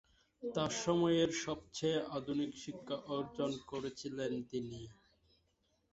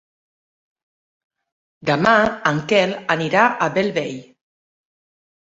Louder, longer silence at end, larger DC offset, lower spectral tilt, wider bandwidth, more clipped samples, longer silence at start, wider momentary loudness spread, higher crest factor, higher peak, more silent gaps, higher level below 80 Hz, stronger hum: second, -38 LUFS vs -18 LUFS; second, 1 s vs 1.4 s; neither; about the same, -4.5 dB/octave vs -5 dB/octave; about the same, 8 kHz vs 8 kHz; neither; second, 0.4 s vs 1.85 s; about the same, 12 LU vs 11 LU; about the same, 20 dB vs 20 dB; second, -20 dBFS vs -2 dBFS; neither; second, -68 dBFS vs -58 dBFS; neither